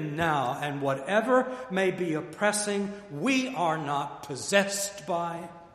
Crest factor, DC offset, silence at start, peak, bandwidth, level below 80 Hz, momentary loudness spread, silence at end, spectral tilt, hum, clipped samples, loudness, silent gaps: 22 dB; under 0.1%; 0 s; -6 dBFS; 15 kHz; -66 dBFS; 7 LU; 0.05 s; -4 dB/octave; none; under 0.1%; -28 LUFS; none